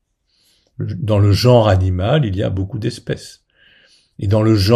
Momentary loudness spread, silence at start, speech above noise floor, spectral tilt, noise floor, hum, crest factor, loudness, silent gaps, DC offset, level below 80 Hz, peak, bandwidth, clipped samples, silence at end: 15 LU; 0.8 s; 47 dB; -7 dB/octave; -61 dBFS; none; 16 dB; -16 LUFS; none; under 0.1%; -42 dBFS; 0 dBFS; 14 kHz; under 0.1%; 0 s